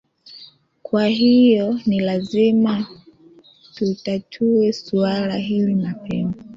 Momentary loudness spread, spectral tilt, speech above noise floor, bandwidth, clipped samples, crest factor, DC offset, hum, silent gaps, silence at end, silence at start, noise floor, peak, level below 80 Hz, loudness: 11 LU; -7.5 dB/octave; 31 dB; 7.4 kHz; under 0.1%; 14 dB; under 0.1%; none; none; 0 s; 0.3 s; -49 dBFS; -6 dBFS; -56 dBFS; -19 LUFS